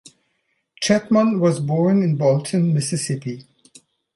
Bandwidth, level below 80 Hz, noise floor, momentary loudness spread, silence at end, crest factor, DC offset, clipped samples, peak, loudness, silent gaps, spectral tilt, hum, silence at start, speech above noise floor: 11.5 kHz; -62 dBFS; -70 dBFS; 9 LU; 0.75 s; 18 dB; under 0.1%; under 0.1%; -2 dBFS; -19 LUFS; none; -6 dB/octave; none; 0.8 s; 52 dB